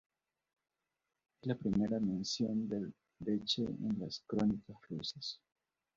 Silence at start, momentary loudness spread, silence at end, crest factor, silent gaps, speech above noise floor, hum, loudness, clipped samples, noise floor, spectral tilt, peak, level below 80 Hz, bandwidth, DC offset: 1.45 s; 10 LU; 0.6 s; 20 dB; none; 52 dB; none; -38 LUFS; under 0.1%; -89 dBFS; -6 dB/octave; -20 dBFS; -66 dBFS; 7.6 kHz; under 0.1%